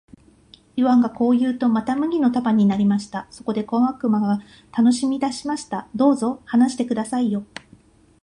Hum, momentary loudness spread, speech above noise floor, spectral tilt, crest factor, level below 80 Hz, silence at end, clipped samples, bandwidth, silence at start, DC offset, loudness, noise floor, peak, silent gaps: none; 11 LU; 32 dB; -6.5 dB/octave; 16 dB; -58 dBFS; 0.8 s; under 0.1%; 11 kHz; 0.75 s; under 0.1%; -21 LUFS; -52 dBFS; -4 dBFS; none